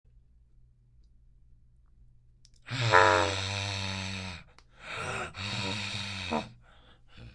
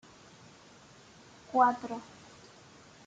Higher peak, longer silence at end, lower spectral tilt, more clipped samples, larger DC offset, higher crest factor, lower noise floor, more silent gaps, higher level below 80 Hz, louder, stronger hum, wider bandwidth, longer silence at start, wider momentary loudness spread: first, -4 dBFS vs -12 dBFS; second, 0 s vs 1.05 s; about the same, -4 dB/octave vs -4.5 dB/octave; neither; neither; first, 30 dB vs 24 dB; first, -60 dBFS vs -56 dBFS; neither; first, -60 dBFS vs -74 dBFS; about the same, -29 LUFS vs -30 LUFS; neither; first, 11.5 kHz vs 9 kHz; first, 2.65 s vs 1.55 s; second, 19 LU vs 28 LU